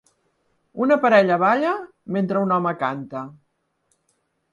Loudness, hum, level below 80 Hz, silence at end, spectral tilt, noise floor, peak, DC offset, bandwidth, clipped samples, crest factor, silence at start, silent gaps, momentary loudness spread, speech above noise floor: -20 LUFS; none; -70 dBFS; 1.2 s; -7.5 dB/octave; -70 dBFS; -2 dBFS; under 0.1%; 10 kHz; under 0.1%; 20 dB; 0.75 s; none; 18 LU; 50 dB